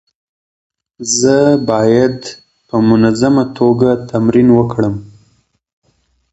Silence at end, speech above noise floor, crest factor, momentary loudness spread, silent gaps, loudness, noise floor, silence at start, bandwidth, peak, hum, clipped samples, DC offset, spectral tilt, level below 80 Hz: 1.25 s; 48 dB; 14 dB; 10 LU; none; -12 LUFS; -59 dBFS; 1 s; 8.2 kHz; 0 dBFS; none; under 0.1%; under 0.1%; -5.5 dB/octave; -44 dBFS